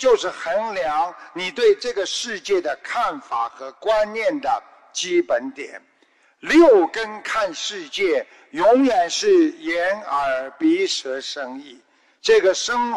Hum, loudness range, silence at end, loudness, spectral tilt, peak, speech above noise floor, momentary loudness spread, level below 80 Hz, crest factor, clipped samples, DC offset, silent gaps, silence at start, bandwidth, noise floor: none; 5 LU; 0 s; -20 LUFS; -2.5 dB/octave; -4 dBFS; 39 dB; 12 LU; -56 dBFS; 16 dB; under 0.1%; under 0.1%; none; 0 s; 12 kHz; -59 dBFS